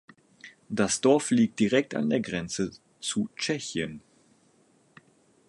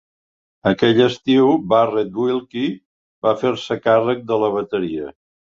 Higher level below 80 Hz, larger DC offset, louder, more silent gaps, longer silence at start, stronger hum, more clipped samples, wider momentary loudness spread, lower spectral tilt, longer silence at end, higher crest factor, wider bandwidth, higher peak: second, -62 dBFS vs -56 dBFS; neither; second, -27 LUFS vs -18 LUFS; second, none vs 2.85-3.22 s; second, 0.45 s vs 0.65 s; neither; neither; about the same, 12 LU vs 10 LU; second, -4.5 dB/octave vs -6.5 dB/octave; first, 1.5 s vs 0.35 s; about the same, 20 dB vs 16 dB; first, 11.5 kHz vs 7.6 kHz; second, -8 dBFS vs -2 dBFS